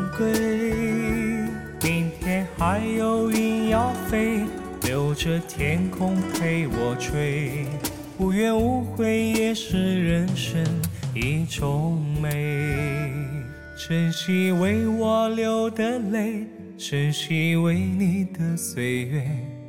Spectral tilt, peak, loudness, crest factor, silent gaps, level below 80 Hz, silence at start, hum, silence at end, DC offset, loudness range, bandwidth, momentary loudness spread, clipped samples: -6 dB/octave; -10 dBFS; -24 LUFS; 14 dB; none; -42 dBFS; 0 s; none; 0 s; under 0.1%; 2 LU; 17.5 kHz; 6 LU; under 0.1%